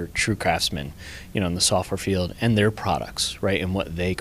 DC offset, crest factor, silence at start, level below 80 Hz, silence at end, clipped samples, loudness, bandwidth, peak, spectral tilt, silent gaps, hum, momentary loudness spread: under 0.1%; 20 dB; 0 s; -42 dBFS; 0 s; under 0.1%; -23 LUFS; 15.5 kHz; -4 dBFS; -4 dB/octave; none; none; 8 LU